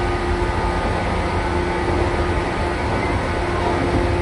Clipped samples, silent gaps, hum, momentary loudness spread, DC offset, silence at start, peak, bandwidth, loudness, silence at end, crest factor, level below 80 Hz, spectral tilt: under 0.1%; none; none; 2 LU; under 0.1%; 0 s; -6 dBFS; 11.5 kHz; -21 LUFS; 0 s; 14 dB; -26 dBFS; -6.5 dB/octave